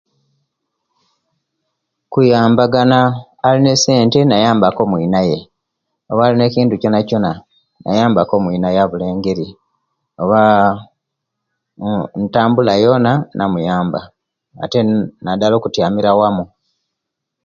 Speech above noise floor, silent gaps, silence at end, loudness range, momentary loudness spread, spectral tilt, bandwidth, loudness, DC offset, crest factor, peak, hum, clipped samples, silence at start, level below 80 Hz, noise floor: 65 dB; none; 1 s; 5 LU; 10 LU; -6 dB/octave; 7.4 kHz; -14 LUFS; under 0.1%; 14 dB; 0 dBFS; none; under 0.1%; 2.1 s; -48 dBFS; -78 dBFS